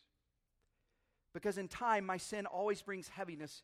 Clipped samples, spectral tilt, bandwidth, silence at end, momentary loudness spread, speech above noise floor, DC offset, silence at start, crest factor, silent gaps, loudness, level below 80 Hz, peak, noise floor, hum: under 0.1%; -4 dB/octave; 15.5 kHz; 0.05 s; 10 LU; 44 dB; under 0.1%; 1.35 s; 20 dB; none; -40 LUFS; -74 dBFS; -22 dBFS; -84 dBFS; none